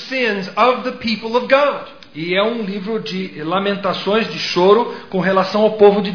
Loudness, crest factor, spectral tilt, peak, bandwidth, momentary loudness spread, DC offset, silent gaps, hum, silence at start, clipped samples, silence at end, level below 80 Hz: -17 LUFS; 16 dB; -6 dB/octave; 0 dBFS; 5.4 kHz; 10 LU; 0.4%; none; none; 0 s; under 0.1%; 0 s; -58 dBFS